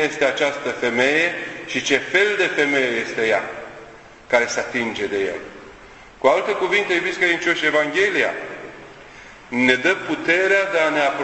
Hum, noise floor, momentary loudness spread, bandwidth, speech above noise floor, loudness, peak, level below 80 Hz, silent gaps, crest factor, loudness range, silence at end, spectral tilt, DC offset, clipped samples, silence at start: none; -43 dBFS; 13 LU; 8.4 kHz; 24 dB; -19 LUFS; 0 dBFS; -58 dBFS; none; 20 dB; 4 LU; 0 s; -3 dB/octave; under 0.1%; under 0.1%; 0 s